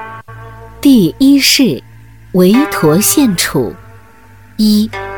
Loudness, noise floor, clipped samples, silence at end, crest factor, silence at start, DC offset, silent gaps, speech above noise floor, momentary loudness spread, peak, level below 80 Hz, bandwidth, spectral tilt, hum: -10 LUFS; -40 dBFS; under 0.1%; 0 s; 12 dB; 0 s; 0.6%; none; 31 dB; 14 LU; 0 dBFS; -42 dBFS; 19.5 kHz; -4 dB/octave; none